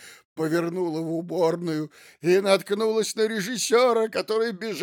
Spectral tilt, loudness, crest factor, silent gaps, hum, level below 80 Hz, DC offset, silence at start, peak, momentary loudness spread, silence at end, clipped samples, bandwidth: -4.5 dB/octave; -24 LUFS; 18 dB; 0.25-0.36 s; none; -82 dBFS; under 0.1%; 0 s; -8 dBFS; 10 LU; 0 s; under 0.1%; 19.5 kHz